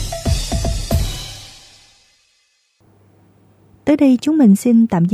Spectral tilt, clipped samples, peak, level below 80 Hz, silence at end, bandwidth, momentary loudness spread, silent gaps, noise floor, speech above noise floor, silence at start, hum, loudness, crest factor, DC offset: -6 dB/octave; under 0.1%; -2 dBFS; -28 dBFS; 0 s; 15.5 kHz; 17 LU; none; -61 dBFS; 49 dB; 0 s; none; -15 LUFS; 14 dB; under 0.1%